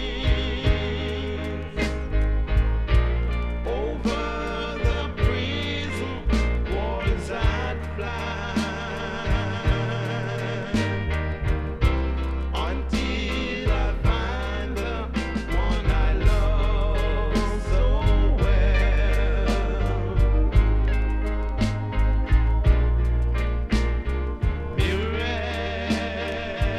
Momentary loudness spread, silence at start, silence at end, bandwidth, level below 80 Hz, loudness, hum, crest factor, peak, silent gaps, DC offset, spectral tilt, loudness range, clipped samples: 6 LU; 0 s; 0 s; 9.6 kHz; -24 dBFS; -25 LUFS; none; 16 dB; -6 dBFS; none; under 0.1%; -6.5 dB/octave; 3 LU; under 0.1%